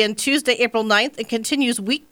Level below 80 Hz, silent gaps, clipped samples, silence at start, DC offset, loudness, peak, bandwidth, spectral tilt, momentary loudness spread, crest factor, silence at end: -64 dBFS; none; under 0.1%; 0 s; under 0.1%; -19 LUFS; -2 dBFS; 19.5 kHz; -2.5 dB/octave; 5 LU; 18 dB; 0.15 s